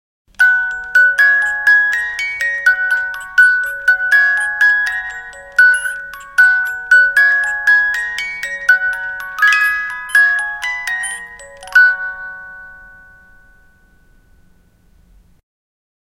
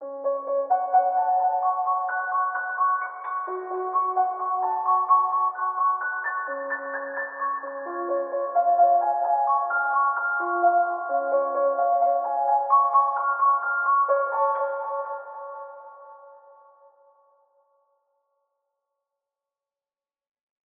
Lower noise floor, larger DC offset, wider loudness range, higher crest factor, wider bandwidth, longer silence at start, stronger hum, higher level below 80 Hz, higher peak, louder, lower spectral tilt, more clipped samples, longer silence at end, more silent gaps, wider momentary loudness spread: second, -51 dBFS vs under -90 dBFS; neither; about the same, 6 LU vs 5 LU; about the same, 16 dB vs 16 dB; first, 16.5 kHz vs 2.4 kHz; first, 0.4 s vs 0 s; neither; first, -52 dBFS vs under -90 dBFS; first, 0 dBFS vs -8 dBFS; first, -12 LUFS vs -24 LUFS; first, 1.5 dB/octave vs 10.5 dB/octave; neither; second, 3.25 s vs 4.3 s; neither; first, 13 LU vs 10 LU